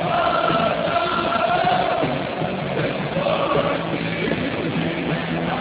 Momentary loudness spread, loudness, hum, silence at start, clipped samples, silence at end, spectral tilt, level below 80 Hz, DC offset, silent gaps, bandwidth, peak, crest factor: 5 LU; -21 LUFS; none; 0 s; under 0.1%; 0 s; -9.5 dB/octave; -46 dBFS; under 0.1%; none; 4 kHz; -6 dBFS; 14 dB